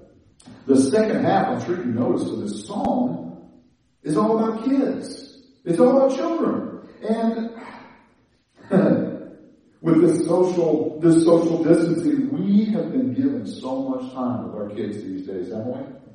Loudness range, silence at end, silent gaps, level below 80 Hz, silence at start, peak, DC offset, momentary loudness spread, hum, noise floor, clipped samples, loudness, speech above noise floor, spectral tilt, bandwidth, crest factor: 6 LU; 0.05 s; none; -62 dBFS; 0.45 s; -2 dBFS; under 0.1%; 14 LU; none; -61 dBFS; under 0.1%; -21 LUFS; 41 dB; -7 dB/octave; 10.5 kHz; 20 dB